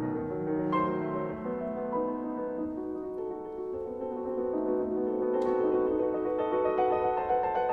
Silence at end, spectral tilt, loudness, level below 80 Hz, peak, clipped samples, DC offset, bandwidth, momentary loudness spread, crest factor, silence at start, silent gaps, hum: 0 s; -9.5 dB/octave; -31 LUFS; -58 dBFS; -16 dBFS; under 0.1%; under 0.1%; 4.8 kHz; 9 LU; 14 dB; 0 s; none; none